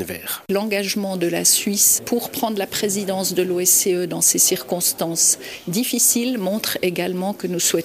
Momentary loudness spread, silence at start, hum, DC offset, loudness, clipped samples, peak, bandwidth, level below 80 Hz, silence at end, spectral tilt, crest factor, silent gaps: 9 LU; 0 s; none; under 0.1%; -18 LUFS; under 0.1%; -4 dBFS; 15.5 kHz; -62 dBFS; 0 s; -2.5 dB/octave; 16 dB; none